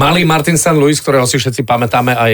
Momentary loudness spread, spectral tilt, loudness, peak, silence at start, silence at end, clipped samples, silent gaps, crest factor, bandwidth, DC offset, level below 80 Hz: 4 LU; -4.5 dB/octave; -11 LUFS; -2 dBFS; 0 s; 0 s; under 0.1%; none; 10 dB; 19.5 kHz; under 0.1%; -42 dBFS